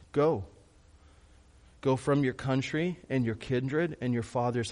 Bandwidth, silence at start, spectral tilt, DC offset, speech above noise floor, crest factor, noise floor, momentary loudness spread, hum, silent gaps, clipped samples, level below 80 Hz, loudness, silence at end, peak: 10.5 kHz; 0 s; -7 dB/octave; under 0.1%; 29 dB; 16 dB; -58 dBFS; 5 LU; none; none; under 0.1%; -58 dBFS; -30 LUFS; 0 s; -14 dBFS